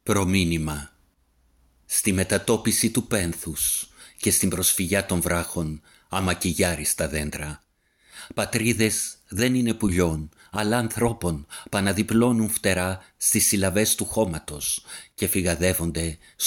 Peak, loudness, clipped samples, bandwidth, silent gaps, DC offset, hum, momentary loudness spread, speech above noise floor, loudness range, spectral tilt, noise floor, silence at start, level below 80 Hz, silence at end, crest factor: -6 dBFS; -23 LUFS; under 0.1%; 17 kHz; none; under 0.1%; none; 10 LU; 40 dB; 3 LU; -4 dB/octave; -64 dBFS; 0.05 s; -44 dBFS; 0 s; 18 dB